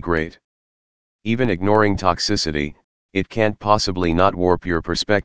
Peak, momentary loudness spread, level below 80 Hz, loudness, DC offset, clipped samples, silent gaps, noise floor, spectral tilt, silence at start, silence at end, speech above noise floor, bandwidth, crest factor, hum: 0 dBFS; 9 LU; -40 dBFS; -20 LUFS; 2%; under 0.1%; 0.44-1.19 s, 2.84-3.09 s; under -90 dBFS; -5 dB/octave; 0 s; 0 s; over 71 dB; 10 kHz; 20 dB; none